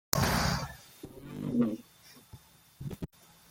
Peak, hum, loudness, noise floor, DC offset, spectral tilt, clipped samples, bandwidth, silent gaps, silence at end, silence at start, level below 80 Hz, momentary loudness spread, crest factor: -4 dBFS; none; -33 LUFS; -57 dBFS; under 0.1%; -4.5 dB/octave; under 0.1%; 17 kHz; none; 0.45 s; 0.15 s; -48 dBFS; 25 LU; 32 dB